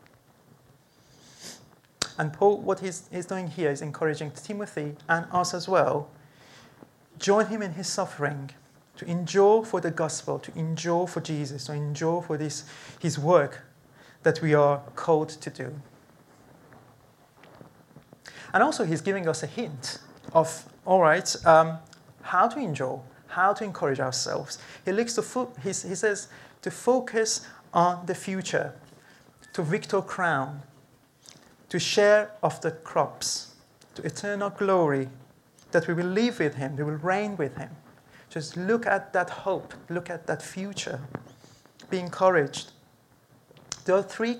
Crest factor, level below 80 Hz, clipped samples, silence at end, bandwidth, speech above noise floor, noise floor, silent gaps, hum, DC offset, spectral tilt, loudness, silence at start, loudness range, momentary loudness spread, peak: 24 dB; -68 dBFS; under 0.1%; 0 s; 15.5 kHz; 34 dB; -60 dBFS; none; none; under 0.1%; -4.5 dB/octave; -27 LUFS; 1.4 s; 6 LU; 15 LU; -4 dBFS